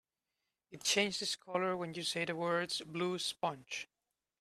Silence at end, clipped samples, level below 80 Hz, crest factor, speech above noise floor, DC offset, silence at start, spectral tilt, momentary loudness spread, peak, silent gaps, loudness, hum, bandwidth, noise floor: 0.55 s; under 0.1%; -80 dBFS; 22 dB; 51 dB; under 0.1%; 0.7 s; -2.5 dB/octave; 10 LU; -16 dBFS; none; -36 LUFS; none; 15 kHz; -89 dBFS